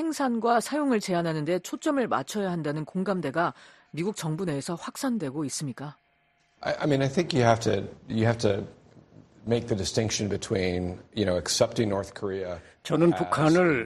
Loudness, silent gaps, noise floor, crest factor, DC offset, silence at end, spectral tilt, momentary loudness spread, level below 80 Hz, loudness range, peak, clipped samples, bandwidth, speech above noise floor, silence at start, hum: -27 LUFS; none; -68 dBFS; 20 dB; under 0.1%; 0 s; -5.5 dB/octave; 10 LU; -56 dBFS; 4 LU; -6 dBFS; under 0.1%; 13 kHz; 41 dB; 0 s; none